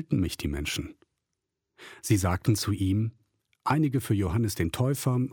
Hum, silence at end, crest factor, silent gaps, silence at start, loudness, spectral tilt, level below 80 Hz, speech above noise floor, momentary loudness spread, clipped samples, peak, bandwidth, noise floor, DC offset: none; 0 s; 18 dB; none; 0 s; -28 LUFS; -6 dB/octave; -46 dBFS; 57 dB; 9 LU; under 0.1%; -10 dBFS; 18 kHz; -84 dBFS; under 0.1%